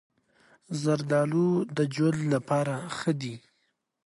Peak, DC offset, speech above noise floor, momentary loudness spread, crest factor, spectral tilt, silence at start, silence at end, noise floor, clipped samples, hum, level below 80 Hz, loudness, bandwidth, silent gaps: -12 dBFS; under 0.1%; 48 dB; 9 LU; 16 dB; -6.5 dB/octave; 0.7 s; 0.7 s; -75 dBFS; under 0.1%; none; -72 dBFS; -28 LUFS; 11.5 kHz; none